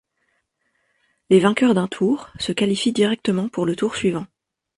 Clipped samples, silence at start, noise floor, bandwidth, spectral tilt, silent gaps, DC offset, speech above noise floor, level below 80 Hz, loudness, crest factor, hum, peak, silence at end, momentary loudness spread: under 0.1%; 1.3 s; -70 dBFS; 11.5 kHz; -5.5 dB/octave; none; under 0.1%; 51 dB; -58 dBFS; -20 LUFS; 18 dB; none; -2 dBFS; 0.5 s; 8 LU